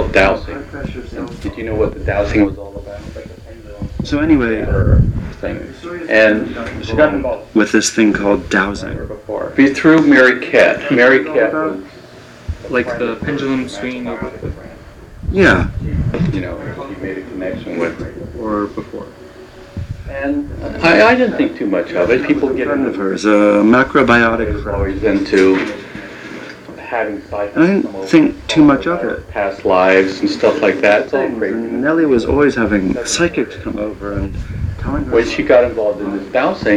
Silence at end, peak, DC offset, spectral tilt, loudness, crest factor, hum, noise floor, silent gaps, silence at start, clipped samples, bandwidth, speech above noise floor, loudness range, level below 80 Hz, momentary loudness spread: 0 s; 0 dBFS; under 0.1%; -5.5 dB/octave; -14 LUFS; 14 dB; none; -37 dBFS; none; 0 s; under 0.1%; 11.5 kHz; 23 dB; 8 LU; -30 dBFS; 17 LU